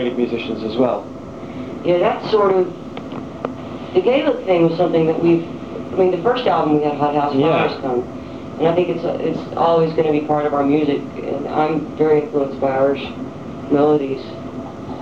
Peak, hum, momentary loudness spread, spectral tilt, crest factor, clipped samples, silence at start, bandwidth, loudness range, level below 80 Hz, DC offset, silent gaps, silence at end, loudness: -2 dBFS; none; 14 LU; -8 dB/octave; 16 dB; under 0.1%; 0 s; 7.6 kHz; 3 LU; -50 dBFS; 0.4%; none; 0 s; -18 LUFS